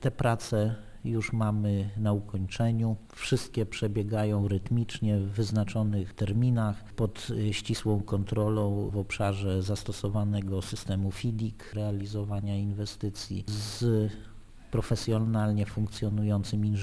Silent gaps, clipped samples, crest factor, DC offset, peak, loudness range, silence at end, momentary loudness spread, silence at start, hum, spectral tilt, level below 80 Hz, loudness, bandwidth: none; under 0.1%; 16 dB; under 0.1%; -12 dBFS; 3 LU; 0 s; 6 LU; 0 s; none; -7 dB/octave; -48 dBFS; -30 LUFS; 11 kHz